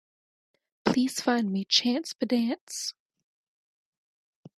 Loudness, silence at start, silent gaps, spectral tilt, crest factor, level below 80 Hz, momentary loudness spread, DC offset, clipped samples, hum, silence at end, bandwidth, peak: -27 LUFS; 0.85 s; 2.61-2.67 s; -3.5 dB/octave; 24 dB; -70 dBFS; 10 LU; under 0.1%; under 0.1%; none; 1.65 s; 14 kHz; -6 dBFS